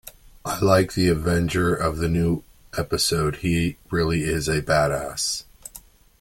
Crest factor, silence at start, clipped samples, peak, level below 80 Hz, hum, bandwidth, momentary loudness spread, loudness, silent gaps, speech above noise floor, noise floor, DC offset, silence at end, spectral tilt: 18 dB; 0.05 s; under 0.1%; -4 dBFS; -40 dBFS; none; 17 kHz; 11 LU; -22 LUFS; none; 26 dB; -48 dBFS; under 0.1%; 0.4 s; -5 dB/octave